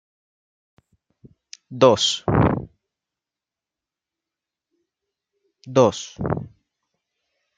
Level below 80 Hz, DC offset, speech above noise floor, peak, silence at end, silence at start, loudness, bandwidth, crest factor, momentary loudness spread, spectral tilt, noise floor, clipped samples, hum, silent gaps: -48 dBFS; under 0.1%; 70 dB; -2 dBFS; 1.1 s; 1.7 s; -20 LUFS; 9.4 kHz; 22 dB; 14 LU; -5 dB/octave; -89 dBFS; under 0.1%; none; none